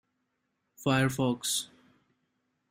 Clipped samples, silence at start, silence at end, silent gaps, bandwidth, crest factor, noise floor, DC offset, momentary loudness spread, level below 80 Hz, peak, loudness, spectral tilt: under 0.1%; 0.8 s; 1.05 s; none; 16 kHz; 20 dB; -80 dBFS; under 0.1%; 8 LU; -66 dBFS; -14 dBFS; -29 LUFS; -4 dB/octave